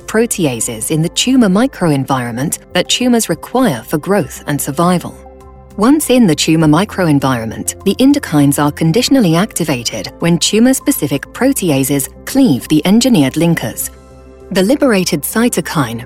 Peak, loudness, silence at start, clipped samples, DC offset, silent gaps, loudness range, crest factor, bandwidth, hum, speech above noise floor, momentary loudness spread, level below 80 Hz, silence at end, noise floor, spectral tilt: -2 dBFS; -13 LUFS; 0.05 s; under 0.1%; under 0.1%; none; 3 LU; 12 dB; 16.5 kHz; none; 24 dB; 8 LU; -40 dBFS; 0 s; -36 dBFS; -4.5 dB/octave